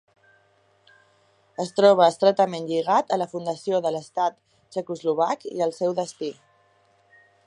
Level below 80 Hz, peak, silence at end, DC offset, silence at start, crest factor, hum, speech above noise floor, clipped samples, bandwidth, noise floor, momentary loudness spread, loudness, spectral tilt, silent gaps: -78 dBFS; -4 dBFS; 1.15 s; under 0.1%; 1.6 s; 22 dB; none; 40 dB; under 0.1%; 11 kHz; -62 dBFS; 15 LU; -23 LUFS; -5 dB/octave; none